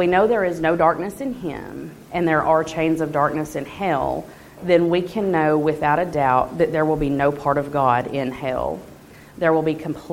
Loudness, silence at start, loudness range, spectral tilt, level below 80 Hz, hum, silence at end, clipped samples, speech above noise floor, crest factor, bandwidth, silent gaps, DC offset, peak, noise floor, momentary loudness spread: -20 LUFS; 0 s; 3 LU; -7 dB/octave; -46 dBFS; none; 0 s; under 0.1%; 22 dB; 18 dB; 16.5 kHz; none; under 0.1%; -2 dBFS; -42 dBFS; 11 LU